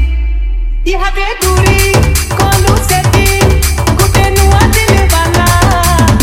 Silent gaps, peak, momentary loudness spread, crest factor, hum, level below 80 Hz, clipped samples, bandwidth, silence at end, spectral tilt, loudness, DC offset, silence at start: none; 0 dBFS; 7 LU; 8 dB; none; -14 dBFS; 0.2%; 17 kHz; 0 s; -4.5 dB/octave; -9 LUFS; under 0.1%; 0 s